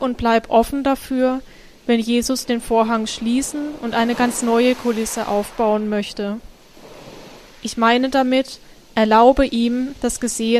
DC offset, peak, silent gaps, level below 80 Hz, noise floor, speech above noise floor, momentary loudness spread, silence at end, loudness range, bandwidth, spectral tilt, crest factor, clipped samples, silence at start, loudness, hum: under 0.1%; -2 dBFS; none; -40 dBFS; -42 dBFS; 24 dB; 12 LU; 0 s; 4 LU; 15.5 kHz; -4 dB/octave; 18 dB; under 0.1%; 0 s; -19 LUFS; none